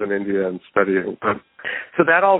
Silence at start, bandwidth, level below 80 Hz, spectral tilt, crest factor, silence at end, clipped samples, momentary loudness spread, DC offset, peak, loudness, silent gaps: 0 s; 4 kHz; -62 dBFS; -11 dB/octave; 18 dB; 0 s; under 0.1%; 10 LU; under 0.1%; 0 dBFS; -21 LUFS; none